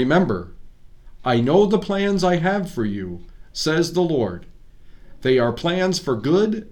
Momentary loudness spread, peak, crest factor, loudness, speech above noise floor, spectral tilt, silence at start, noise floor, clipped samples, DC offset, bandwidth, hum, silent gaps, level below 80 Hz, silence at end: 12 LU; -4 dBFS; 16 dB; -20 LUFS; 22 dB; -6 dB/octave; 0 s; -42 dBFS; under 0.1%; under 0.1%; 17 kHz; none; none; -44 dBFS; 0 s